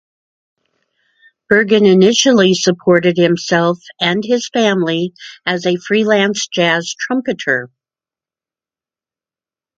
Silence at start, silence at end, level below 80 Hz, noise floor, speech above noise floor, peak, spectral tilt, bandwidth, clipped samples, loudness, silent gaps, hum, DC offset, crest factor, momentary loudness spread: 1.5 s; 2.15 s; -60 dBFS; under -90 dBFS; over 77 dB; 0 dBFS; -4.5 dB/octave; 9 kHz; under 0.1%; -14 LUFS; none; none; under 0.1%; 16 dB; 9 LU